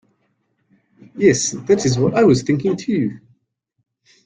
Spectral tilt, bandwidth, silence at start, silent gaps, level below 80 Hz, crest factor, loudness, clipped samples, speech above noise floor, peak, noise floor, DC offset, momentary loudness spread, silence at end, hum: -5.5 dB/octave; 9.6 kHz; 1.15 s; none; -54 dBFS; 18 dB; -17 LUFS; under 0.1%; 52 dB; -2 dBFS; -68 dBFS; under 0.1%; 7 LU; 1.1 s; none